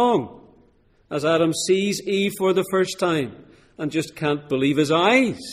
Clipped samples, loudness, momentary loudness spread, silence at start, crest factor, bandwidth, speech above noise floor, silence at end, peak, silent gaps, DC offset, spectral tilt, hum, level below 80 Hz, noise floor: under 0.1%; -21 LUFS; 9 LU; 0 s; 18 dB; 15.5 kHz; 37 dB; 0 s; -4 dBFS; none; under 0.1%; -4.5 dB/octave; none; -60 dBFS; -58 dBFS